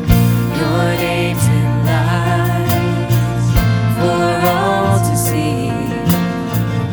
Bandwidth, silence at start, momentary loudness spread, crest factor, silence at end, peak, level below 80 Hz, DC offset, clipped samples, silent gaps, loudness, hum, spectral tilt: over 20 kHz; 0 s; 4 LU; 14 dB; 0 s; 0 dBFS; -28 dBFS; under 0.1%; under 0.1%; none; -15 LUFS; none; -6 dB/octave